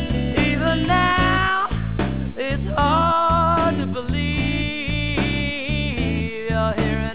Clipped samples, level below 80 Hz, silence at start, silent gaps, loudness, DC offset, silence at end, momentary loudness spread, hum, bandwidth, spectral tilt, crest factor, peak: under 0.1%; -30 dBFS; 0 s; none; -20 LUFS; 1%; 0 s; 7 LU; none; 4 kHz; -10 dB/octave; 16 dB; -4 dBFS